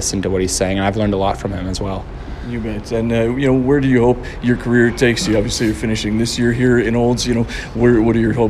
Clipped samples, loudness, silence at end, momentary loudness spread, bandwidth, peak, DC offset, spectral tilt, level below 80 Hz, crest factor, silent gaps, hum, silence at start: under 0.1%; -16 LUFS; 0 s; 9 LU; 13.5 kHz; 0 dBFS; under 0.1%; -5.5 dB/octave; -30 dBFS; 16 dB; none; none; 0 s